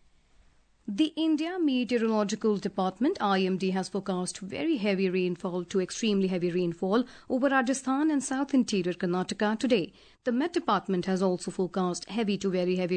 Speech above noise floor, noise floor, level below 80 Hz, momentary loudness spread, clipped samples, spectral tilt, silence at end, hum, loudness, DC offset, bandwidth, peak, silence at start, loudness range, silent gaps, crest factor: 34 dB; -61 dBFS; -66 dBFS; 5 LU; under 0.1%; -5.5 dB/octave; 0 s; none; -28 LUFS; under 0.1%; 9.4 kHz; -12 dBFS; 0.9 s; 2 LU; none; 16 dB